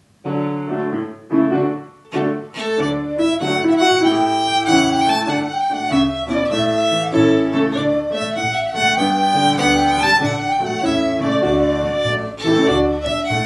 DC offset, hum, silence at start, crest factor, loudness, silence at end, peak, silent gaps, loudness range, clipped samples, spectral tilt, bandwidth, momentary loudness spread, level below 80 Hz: under 0.1%; none; 0.25 s; 16 dB; -18 LUFS; 0 s; -2 dBFS; none; 2 LU; under 0.1%; -5 dB/octave; 12 kHz; 8 LU; -42 dBFS